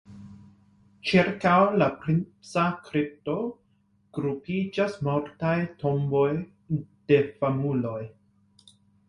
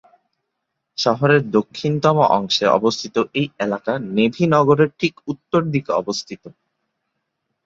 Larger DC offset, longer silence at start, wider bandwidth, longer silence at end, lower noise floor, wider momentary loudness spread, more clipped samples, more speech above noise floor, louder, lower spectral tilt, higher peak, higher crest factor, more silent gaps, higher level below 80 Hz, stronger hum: neither; second, 0.1 s vs 1 s; first, 11 kHz vs 7.8 kHz; second, 1 s vs 1.15 s; second, -66 dBFS vs -77 dBFS; first, 12 LU vs 9 LU; neither; second, 41 dB vs 59 dB; second, -26 LUFS vs -18 LUFS; first, -7.5 dB/octave vs -5.5 dB/octave; second, -8 dBFS vs -2 dBFS; about the same, 18 dB vs 18 dB; neither; about the same, -60 dBFS vs -60 dBFS; neither